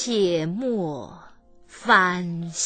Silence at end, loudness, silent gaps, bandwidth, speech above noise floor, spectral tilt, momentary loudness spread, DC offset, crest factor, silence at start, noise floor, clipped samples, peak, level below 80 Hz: 0 s; -22 LUFS; none; 9.2 kHz; 26 dB; -4 dB/octave; 16 LU; under 0.1%; 20 dB; 0 s; -49 dBFS; under 0.1%; -4 dBFS; -58 dBFS